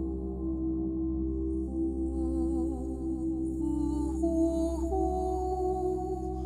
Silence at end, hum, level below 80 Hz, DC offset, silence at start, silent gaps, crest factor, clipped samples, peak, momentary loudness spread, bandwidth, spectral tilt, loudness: 0 s; none; -38 dBFS; under 0.1%; 0 s; none; 14 dB; under 0.1%; -18 dBFS; 5 LU; 10.5 kHz; -9.5 dB/octave; -32 LUFS